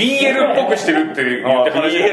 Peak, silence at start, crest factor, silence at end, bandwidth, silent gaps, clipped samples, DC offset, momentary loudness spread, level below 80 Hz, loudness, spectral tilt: -2 dBFS; 0 s; 12 dB; 0 s; 12 kHz; none; under 0.1%; under 0.1%; 3 LU; -66 dBFS; -15 LUFS; -4 dB/octave